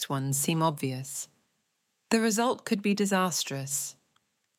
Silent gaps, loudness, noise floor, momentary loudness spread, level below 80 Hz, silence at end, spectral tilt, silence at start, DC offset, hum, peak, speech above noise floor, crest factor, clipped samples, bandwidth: none; -28 LUFS; -77 dBFS; 11 LU; -76 dBFS; 0.65 s; -4 dB/octave; 0 s; under 0.1%; none; -10 dBFS; 49 dB; 20 dB; under 0.1%; 17 kHz